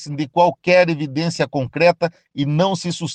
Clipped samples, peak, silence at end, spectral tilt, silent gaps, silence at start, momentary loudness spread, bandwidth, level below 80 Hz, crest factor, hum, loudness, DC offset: under 0.1%; -4 dBFS; 0 s; -5.5 dB/octave; none; 0 s; 8 LU; 9.4 kHz; -58 dBFS; 16 dB; none; -18 LUFS; under 0.1%